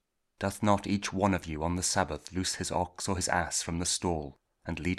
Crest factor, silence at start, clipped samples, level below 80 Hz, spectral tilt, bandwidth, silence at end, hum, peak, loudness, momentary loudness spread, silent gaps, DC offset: 22 dB; 0.4 s; under 0.1%; -50 dBFS; -4 dB/octave; 15 kHz; 0 s; none; -10 dBFS; -31 LUFS; 8 LU; none; under 0.1%